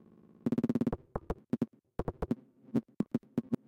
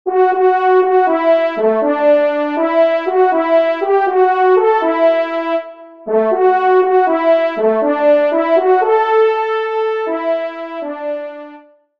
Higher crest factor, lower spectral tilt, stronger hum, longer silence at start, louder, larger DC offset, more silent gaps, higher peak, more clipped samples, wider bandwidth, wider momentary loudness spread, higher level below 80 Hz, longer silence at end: first, 18 dB vs 12 dB; first, -9.5 dB/octave vs -6.5 dB/octave; neither; first, 0.45 s vs 0.05 s; second, -37 LUFS vs -14 LUFS; second, under 0.1% vs 0.3%; neither; second, -18 dBFS vs -2 dBFS; neither; first, 9.2 kHz vs 5.6 kHz; about the same, 9 LU vs 11 LU; first, -50 dBFS vs -68 dBFS; second, 0.15 s vs 0.4 s